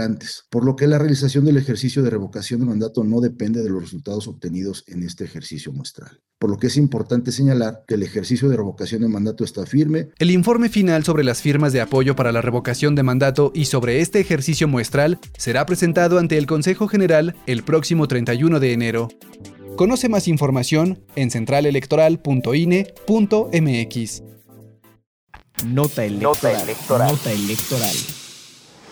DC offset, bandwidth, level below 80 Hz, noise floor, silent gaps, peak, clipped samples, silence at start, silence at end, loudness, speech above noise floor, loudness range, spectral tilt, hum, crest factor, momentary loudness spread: under 0.1%; over 20 kHz; -50 dBFS; -48 dBFS; 25.06-25.27 s; -6 dBFS; under 0.1%; 0 s; 0 s; -19 LUFS; 29 dB; 5 LU; -6 dB/octave; none; 12 dB; 11 LU